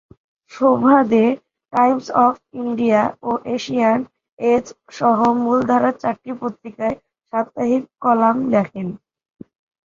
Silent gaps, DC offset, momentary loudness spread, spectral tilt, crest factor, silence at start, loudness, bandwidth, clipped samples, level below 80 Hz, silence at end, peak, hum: 4.32-4.37 s; under 0.1%; 12 LU; -7 dB/octave; 16 dB; 0.5 s; -18 LUFS; 7.4 kHz; under 0.1%; -60 dBFS; 0.95 s; -2 dBFS; none